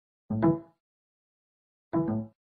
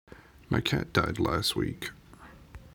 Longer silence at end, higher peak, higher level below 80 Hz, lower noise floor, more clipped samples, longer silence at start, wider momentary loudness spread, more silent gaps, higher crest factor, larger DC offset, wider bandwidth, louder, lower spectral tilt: first, 0.3 s vs 0.05 s; second, -12 dBFS vs -8 dBFS; second, -60 dBFS vs -48 dBFS; first, under -90 dBFS vs -52 dBFS; neither; first, 0.3 s vs 0.1 s; second, 8 LU vs 13 LU; first, 0.80-1.91 s vs none; about the same, 22 dB vs 24 dB; neither; second, 3.7 kHz vs over 20 kHz; about the same, -30 LUFS vs -29 LUFS; first, -10.5 dB/octave vs -5 dB/octave